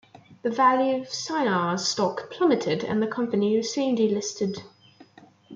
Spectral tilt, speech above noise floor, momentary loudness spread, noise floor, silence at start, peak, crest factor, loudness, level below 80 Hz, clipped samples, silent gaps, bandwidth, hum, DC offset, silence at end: -4.5 dB/octave; 28 dB; 9 LU; -52 dBFS; 0.3 s; -8 dBFS; 16 dB; -25 LUFS; -70 dBFS; under 0.1%; none; 9 kHz; none; under 0.1%; 0 s